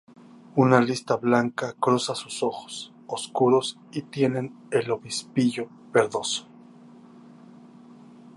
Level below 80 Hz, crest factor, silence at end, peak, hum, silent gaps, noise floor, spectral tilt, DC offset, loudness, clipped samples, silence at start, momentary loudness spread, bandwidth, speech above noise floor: -70 dBFS; 24 dB; 1.95 s; -2 dBFS; none; none; -49 dBFS; -5 dB/octave; under 0.1%; -25 LUFS; under 0.1%; 0.55 s; 13 LU; 11.5 kHz; 25 dB